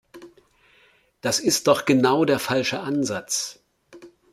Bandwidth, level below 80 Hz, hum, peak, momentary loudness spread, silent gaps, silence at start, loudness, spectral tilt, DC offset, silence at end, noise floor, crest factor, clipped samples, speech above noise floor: 16 kHz; -66 dBFS; none; -2 dBFS; 8 LU; none; 0.15 s; -22 LUFS; -3.5 dB/octave; under 0.1%; 0.25 s; -59 dBFS; 22 dB; under 0.1%; 38 dB